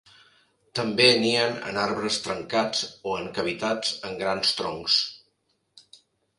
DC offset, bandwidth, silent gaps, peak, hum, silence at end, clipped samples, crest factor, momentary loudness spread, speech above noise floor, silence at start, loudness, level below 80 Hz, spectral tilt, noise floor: under 0.1%; 11.5 kHz; none; -6 dBFS; none; 0.4 s; under 0.1%; 22 dB; 12 LU; 47 dB; 0.75 s; -24 LUFS; -64 dBFS; -3 dB/octave; -72 dBFS